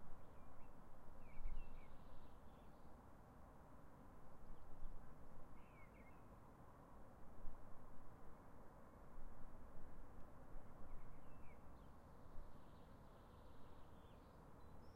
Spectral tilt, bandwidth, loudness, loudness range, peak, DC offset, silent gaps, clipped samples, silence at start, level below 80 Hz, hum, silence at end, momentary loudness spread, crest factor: -7 dB/octave; 4 kHz; -64 LUFS; 2 LU; -34 dBFS; under 0.1%; none; under 0.1%; 0 s; -58 dBFS; none; 0 s; 3 LU; 16 dB